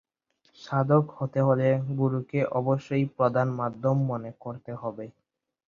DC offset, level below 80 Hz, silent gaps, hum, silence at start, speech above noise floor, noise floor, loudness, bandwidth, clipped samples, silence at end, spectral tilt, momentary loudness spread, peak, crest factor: under 0.1%; -66 dBFS; none; none; 0.6 s; 44 dB; -70 dBFS; -27 LUFS; 6.8 kHz; under 0.1%; 0.55 s; -9.5 dB/octave; 14 LU; -8 dBFS; 18 dB